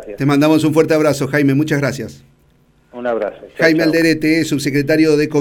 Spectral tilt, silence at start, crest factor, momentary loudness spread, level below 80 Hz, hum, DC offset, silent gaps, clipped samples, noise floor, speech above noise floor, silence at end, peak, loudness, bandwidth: -6 dB/octave; 0 s; 14 dB; 9 LU; -48 dBFS; none; under 0.1%; none; under 0.1%; -53 dBFS; 39 dB; 0 s; 0 dBFS; -15 LUFS; 17 kHz